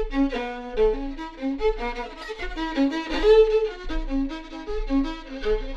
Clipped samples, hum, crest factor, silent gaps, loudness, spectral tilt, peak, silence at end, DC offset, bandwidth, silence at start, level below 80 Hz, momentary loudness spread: under 0.1%; none; 16 dB; none; -25 LUFS; -6 dB/octave; -8 dBFS; 0 s; under 0.1%; 7.8 kHz; 0 s; -34 dBFS; 15 LU